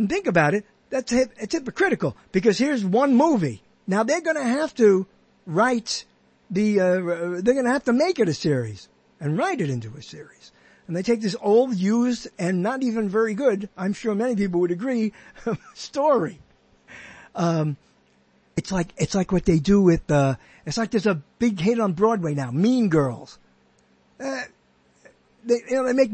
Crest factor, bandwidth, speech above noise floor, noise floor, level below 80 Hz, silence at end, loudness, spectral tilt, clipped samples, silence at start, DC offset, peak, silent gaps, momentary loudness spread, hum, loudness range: 18 dB; 8.8 kHz; 39 dB; -61 dBFS; -50 dBFS; 0 s; -23 LUFS; -6 dB/octave; under 0.1%; 0 s; under 0.1%; -4 dBFS; none; 13 LU; none; 5 LU